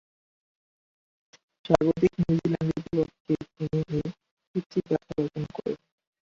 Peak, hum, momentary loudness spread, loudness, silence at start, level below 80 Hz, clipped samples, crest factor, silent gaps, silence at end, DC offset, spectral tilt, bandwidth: -4 dBFS; none; 11 LU; -28 LUFS; 1.65 s; -54 dBFS; under 0.1%; 26 dB; 3.20-3.25 s, 4.31-4.37 s, 4.47-4.54 s, 4.66-4.70 s; 0.5 s; under 0.1%; -8.5 dB/octave; 7.6 kHz